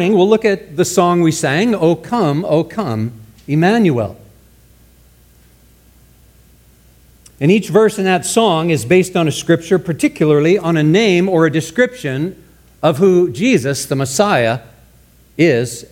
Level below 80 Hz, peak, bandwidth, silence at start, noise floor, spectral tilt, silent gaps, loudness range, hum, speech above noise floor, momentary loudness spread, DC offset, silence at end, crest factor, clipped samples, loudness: -50 dBFS; 0 dBFS; 17 kHz; 0 s; -48 dBFS; -5.5 dB/octave; none; 6 LU; none; 34 dB; 8 LU; under 0.1%; 0.05 s; 14 dB; under 0.1%; -14 LUFS